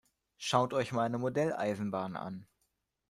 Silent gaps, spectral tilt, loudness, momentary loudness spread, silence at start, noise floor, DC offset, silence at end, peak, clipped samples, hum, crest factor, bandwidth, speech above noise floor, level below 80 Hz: none; -5.5 dB/octave; -34 LUFS; 12 LU; 0.4 s; -81 dBFS; under 0.1%; 0.65 s; -12 dBFS; under 0.1%; none; 22 dB; 15.5 kHz; 48 dB; -70 dBFS